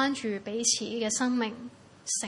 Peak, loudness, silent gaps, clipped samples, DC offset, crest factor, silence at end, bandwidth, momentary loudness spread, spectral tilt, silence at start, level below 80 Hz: -12 dBFS; -29 LUFS; none; under 0.1%; under 0.1%; 18 dB; 0 s; 11.5 kHz; 16 LU; -2 dB/octave; 0 s; -74 dBFS